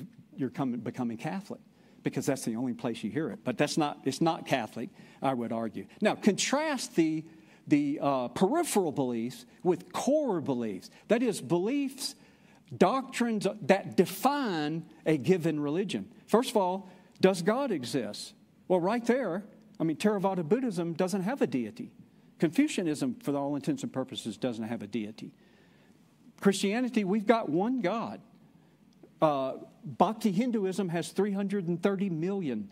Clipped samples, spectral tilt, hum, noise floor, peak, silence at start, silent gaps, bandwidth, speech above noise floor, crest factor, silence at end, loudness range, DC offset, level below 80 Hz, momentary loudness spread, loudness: under 0.1%; -5.5 dB/octave; none; -61 dBFS; -8 dBFS; 0 s; none; 16 kHz; 31 dB; 24 dB; 0.05 s; 4 LU; under 0.1%; -76 dBFS; 11 LU; -30 LUFS